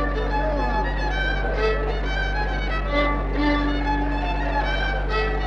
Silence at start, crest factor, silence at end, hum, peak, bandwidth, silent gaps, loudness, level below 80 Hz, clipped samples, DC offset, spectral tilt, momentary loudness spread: 0 s; 12 dB; 0 s; none; -10 dBFS; 6.6 kHz; none; -24 LUFS; -26 dBFS; under 0.1%; under 0.1%; -6.5 dB/octave; 3 LU